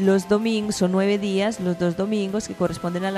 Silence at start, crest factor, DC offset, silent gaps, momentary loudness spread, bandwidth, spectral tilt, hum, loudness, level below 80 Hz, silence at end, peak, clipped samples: 0 s; 16 dB; under 0.1%; none; 5 LU; 14 kHz; -6 dB/octave; none; -23 LUFS; -54 dBFS; 0 s; -6 dBFS; under 0.1%